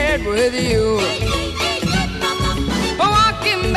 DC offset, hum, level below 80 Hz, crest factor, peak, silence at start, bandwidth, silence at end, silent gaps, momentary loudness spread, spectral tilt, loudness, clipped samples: under 0.1%; none; -28 dBFS; 16 dB; -2 dBFS; 0 s; 14 kHz; 0 s; none; 6 LU; -4.5 dB/octave; -17 LUFS; under 0.1%